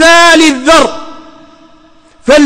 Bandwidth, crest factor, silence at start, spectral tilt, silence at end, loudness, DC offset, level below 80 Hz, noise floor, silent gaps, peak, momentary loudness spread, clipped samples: 16.5 kHz; 8 dB; 0 s; -1.5 dB/octave; 0 s; -5 LUFS; under 0.1%; -36 dBFS; -41 dBFS; none; 0 dBFS; 17 LU; 0.3%